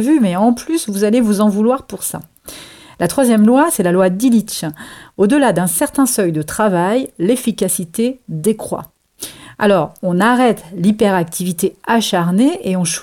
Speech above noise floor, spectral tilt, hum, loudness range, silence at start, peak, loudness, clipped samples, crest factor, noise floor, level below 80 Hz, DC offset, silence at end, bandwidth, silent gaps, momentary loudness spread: 19 dB; -5 dB/octave; none; 4 LU; 0 s; -4 dBFS; -15 LUFS; under 0.1%; 12 dB; -33 dBFS; -52 dBFS; under 0.1%; 0 s; 17.5 kHz; none; 14 LU